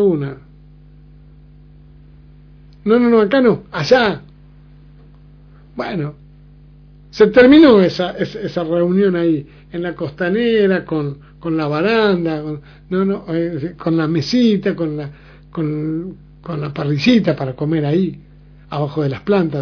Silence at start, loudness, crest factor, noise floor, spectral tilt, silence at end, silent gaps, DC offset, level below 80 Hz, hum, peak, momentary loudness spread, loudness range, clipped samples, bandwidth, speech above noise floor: 0 s; -16 LUFS; 16 dB; -43 dBFS; -7.5 dB/octave; 0 s; none; under 0.1%; -46 dBFS; 50 Hz at -40 dBFS; 0 dBFS; 16 LU; 6 LU; under 0.1%; 5.4 kHz; 27 dB